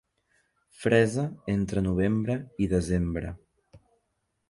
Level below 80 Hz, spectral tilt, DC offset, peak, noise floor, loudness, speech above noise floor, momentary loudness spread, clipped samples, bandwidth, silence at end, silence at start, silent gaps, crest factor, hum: -44 dBFS; -7 dB/octave; under 0.1%; -8 dBFS; -77 dBFS; -27 LUFS; 51 dB; 10 LU; under 0.1%; 11.5 kHz; 0.75 s; 0.8 s; none; 20 dB; none